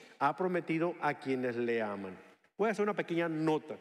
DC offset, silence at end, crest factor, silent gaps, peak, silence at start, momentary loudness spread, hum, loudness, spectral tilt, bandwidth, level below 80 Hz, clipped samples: under 0.1%; 0 s; 18 dB; none; -16 dBFS; 0 s; 6 LU; none; -34 LUFS; -7 dB/octave; 12.5 kHz; -88 dBFS; under 0.1%